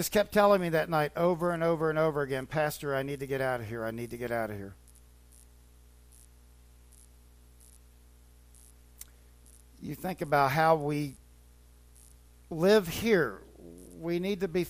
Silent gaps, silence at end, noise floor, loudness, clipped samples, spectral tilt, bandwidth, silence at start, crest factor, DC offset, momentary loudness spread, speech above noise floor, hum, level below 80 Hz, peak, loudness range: none; 0 s; -57 dBFS; -29 LUFS; under 0.1%; -5.5 dB/octave; 15.5 kHz; 0 s; 20 dB; under 0.1%; 22 LU; 28 dB; 60 Hz at -55 dBFS; -56 dBFS; -12 dBFS; 13 LU